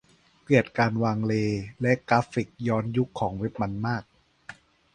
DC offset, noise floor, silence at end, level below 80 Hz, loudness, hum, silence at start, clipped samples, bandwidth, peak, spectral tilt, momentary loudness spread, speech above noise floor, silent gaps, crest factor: under 0.1%; -49 dBFS; 0.4 s; -56 dBFS; -26 LUFS; none; 0.5 s; under 0.1%; 9.6 kHz; -6 dBFS; -7.5 dB/octave; 8 LU; 23 dB; none; 22 dB